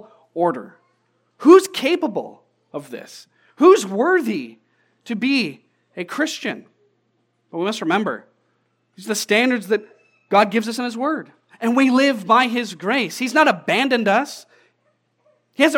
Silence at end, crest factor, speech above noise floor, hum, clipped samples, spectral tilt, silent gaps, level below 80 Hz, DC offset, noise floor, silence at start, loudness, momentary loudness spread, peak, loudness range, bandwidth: 0 s; 20 dB; 49 dB; none; under 0.1%; -4 dB/octave; none; -88 dBFS; under 0.1%; -67 dBFS; 0.35 s; -18 LUFS; 20 LU; 0 dBFS; 8 LU; 17 kHz